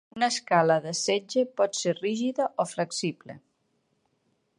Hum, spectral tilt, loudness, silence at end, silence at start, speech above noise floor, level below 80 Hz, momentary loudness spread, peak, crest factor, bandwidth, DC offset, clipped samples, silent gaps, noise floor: none; -3.5 dB/octave; -27 LUFS; 1.2 s; 0.15 s; 46 dB; -76 dBFS; 7 LU; -8 dBFS; 20 dB; 11.5 kHz; under 0.1%; under 0.1%; none; -73 dBFS